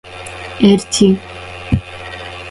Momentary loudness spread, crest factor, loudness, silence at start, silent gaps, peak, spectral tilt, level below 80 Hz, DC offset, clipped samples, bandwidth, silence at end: 17 LU; 16 dB; -14 LUFS; 0.05 s; none; 0 dBFS; -5.5 dB/octave; -36 dBFS; under 0.1%; under 0.1%; 11.5 kHz; 0 s